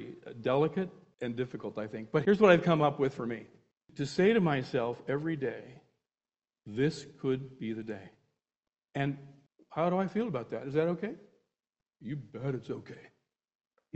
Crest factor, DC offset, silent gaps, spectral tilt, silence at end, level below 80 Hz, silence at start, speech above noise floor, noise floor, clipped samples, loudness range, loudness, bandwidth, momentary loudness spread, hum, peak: 26 dB; under 0.1%; none; -7.5 dB/octave; 0.95 s; -68 dBFS; 0 s; over 59 dB; under -90 dBFS; under 0.1%; 9 LU; -32 LUFS; 8.4 kHz; 17 LU; none; -8 dBFS